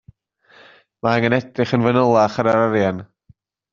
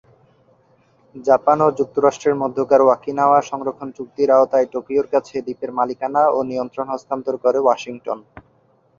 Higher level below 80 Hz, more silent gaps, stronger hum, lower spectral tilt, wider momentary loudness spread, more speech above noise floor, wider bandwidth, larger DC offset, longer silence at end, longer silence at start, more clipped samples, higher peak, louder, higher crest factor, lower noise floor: first, -56 dBFS vs -62 dBFS; neither; neither; about the same, -5.5 dB/octave vs -6 dB/octave; second, 7 LU vs 13 LU; about the same, 38 dB vs 40 dB; about the same, 7.4 kHz vs 7.4 kHz; neither; about the same, 0.7 s vs 0.6 s; about the same, 1.05 s vs 1.15 s; neither; about the same, -2 dBFS vs -2 dBFS; about the same, -18 LUFS vs -18 LUFS; about the same, 18 dB vs 18 dB; about the same, -55 dBFS vs -58 dBFS